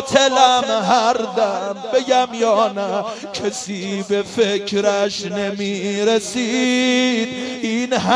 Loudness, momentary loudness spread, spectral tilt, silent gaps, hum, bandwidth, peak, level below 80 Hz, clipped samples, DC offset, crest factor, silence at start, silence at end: -18 LUFS; 9 LU; -3.5 dB/octave; none; none; 11 kHz; 0 dBFS; -60 dBFS; under 0.1%; under 0.1%; 18 dB; 0 s; 0 s